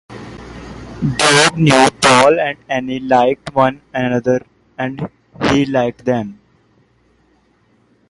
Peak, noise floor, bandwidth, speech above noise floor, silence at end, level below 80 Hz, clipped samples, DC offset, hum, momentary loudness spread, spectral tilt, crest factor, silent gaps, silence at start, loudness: 0 dBFS; -56 dBFS; 11.5 kHz; 42 dB; 1.75 s; -44 dBFS; under 0.1%; under 0.1%; none; 22 LU; -4 dB/octave; 16 dB; none; 0.1 s; -14 LUFS